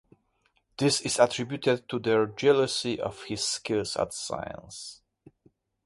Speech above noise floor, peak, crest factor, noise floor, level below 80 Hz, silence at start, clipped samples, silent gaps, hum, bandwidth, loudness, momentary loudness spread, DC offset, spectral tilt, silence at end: 44 dB; -6 dBFS; 24 dB; -71 dBFS; -62 dBFS; 0.8 s; under 0.1%; none; none; 11.5 kHz; -27 LUFS; 16 LU; under 0.1%; -3.5 dB/octave; 0.9 s